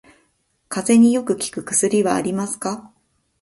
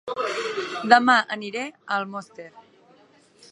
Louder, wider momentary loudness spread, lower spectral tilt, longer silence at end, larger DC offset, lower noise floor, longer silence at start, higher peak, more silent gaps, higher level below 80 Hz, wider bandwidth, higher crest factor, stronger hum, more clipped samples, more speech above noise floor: first, -19 LUFS vs -22 LUFS; second, 13 LU vs 20 LU; about the same, -4.5 dB/octave vs -3.5 dB/octave; second, 0.55 s vs 0.9 s; neither; first, -66 dBFS vs -56 dBFS; first, 0.7 s vs 0.05 s; about the same, -4 dBFS vs -2 dBFS; neither; first, -60 dBFS vs -78 dBFS; about the same, 11.5 kHz vs 11 kHz; second, 18 dB vs 24 dB; neither; neither; first, 48 dB vs 34 dB